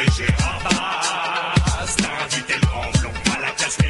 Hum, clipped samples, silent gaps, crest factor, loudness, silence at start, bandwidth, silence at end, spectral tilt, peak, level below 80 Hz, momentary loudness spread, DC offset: none; under 0.1%; none; 20 dB; -20 LUFS; 0 s; 11.5 kHz; 0 s; -4 dB/octave; 0 dBFS; -28 dBFS; 2 LU; under 0.1%